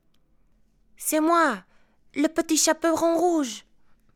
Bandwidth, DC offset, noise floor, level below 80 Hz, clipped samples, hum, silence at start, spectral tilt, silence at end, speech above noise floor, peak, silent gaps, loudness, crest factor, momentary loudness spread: 18 kHz; under 0.1%; -61 dBFS; -64 dBFS; under 0.1%; none; 1 s; -2 dB/octave; 0.55 s; 39 dB; -6 dBFS; none; -23 LUFS; 18 dB; 13 LU